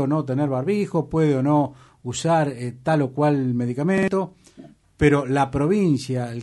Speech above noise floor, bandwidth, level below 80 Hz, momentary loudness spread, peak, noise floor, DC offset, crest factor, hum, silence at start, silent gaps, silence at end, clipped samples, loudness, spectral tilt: 26 dB; 11.5 kHz; -48 dBFS; 7 LU; -4 dBFS; -47 dBFS; under 0.1%; 18 dB; none; 0 s; none; 0 s; under 0.1%; -22 LUFS; -7 dB/octave